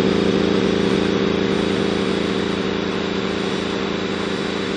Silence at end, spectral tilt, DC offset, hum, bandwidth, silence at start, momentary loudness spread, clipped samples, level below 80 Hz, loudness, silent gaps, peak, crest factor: 0 s; -5.5 dB/octave; under 0.1%; none; 10 kHz; 0 s; 5 LU; under 0.1%; -46 dBFS; -20 LUFS; none; -6 dBFS; 14 dB